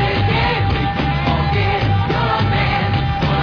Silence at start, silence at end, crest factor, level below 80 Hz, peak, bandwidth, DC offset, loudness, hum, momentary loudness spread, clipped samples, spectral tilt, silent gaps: 0 s; 0 s; 14 dB; -26 dBFS; -2 dBFS; 5.4 kHz; under 0.1%; -17 LUFS; none; 2 LU; under 0.1%; -7.5 dB/octave; none